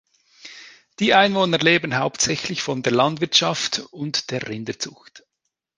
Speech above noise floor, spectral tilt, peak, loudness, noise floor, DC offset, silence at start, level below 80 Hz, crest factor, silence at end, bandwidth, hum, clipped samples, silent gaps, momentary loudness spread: 58 dB; -3 dB/octave; -2 dBFS; -20 LUFS; -79 dBFS; under 0.1%; 0.45 s; -60 dBFS; 20 dB; 0.6 s; 10.5 kHz; none; under 0.1%; none; 14 LU